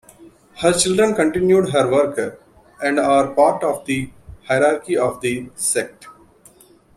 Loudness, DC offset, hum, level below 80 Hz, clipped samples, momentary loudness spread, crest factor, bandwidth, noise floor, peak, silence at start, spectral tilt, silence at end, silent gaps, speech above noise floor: -18 LUFS; under 0.1%; none; -52 dBFS; under 0.1%; 9 LU; 18 dB; 14.5 kHz; -50 dBFS; -2 dBFS; 0.2 s; -4 dB/octave; 0.85 s; none; 32 dB